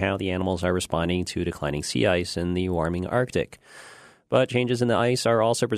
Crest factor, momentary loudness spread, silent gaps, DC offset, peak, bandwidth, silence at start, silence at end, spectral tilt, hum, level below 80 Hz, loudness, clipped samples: 20 dB; 7 LU; none; under 0.1%; -6 dBFS; 13.5 kHz; 0 s; 0 s; -5.5 dB/octave; none; -48 dBFS; -24 LUFS; under 0.1%